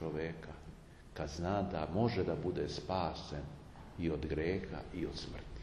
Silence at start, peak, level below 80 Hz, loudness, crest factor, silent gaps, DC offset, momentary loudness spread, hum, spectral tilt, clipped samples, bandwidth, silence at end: 0 s; -20 dBFS; -52 dBFS; -39 LUFS; 18 dB; none; under 0.1%; 17 LU; none; -6.5 dB/octave; under 0.1%; 12 kHz; 0 s